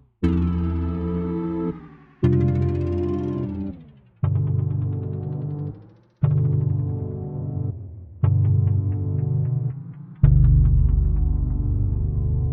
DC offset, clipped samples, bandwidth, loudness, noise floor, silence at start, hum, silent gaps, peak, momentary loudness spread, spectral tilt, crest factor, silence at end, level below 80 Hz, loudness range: under 0.1%; under 0.1%; 3.8 kHz; -23 LUFS; -46 dBFS; 0.2 s; none; none; -2 dBFS; 11 LU; -12 dB/octave; 20 dB; 0 s; -28 dBFS; 5 LU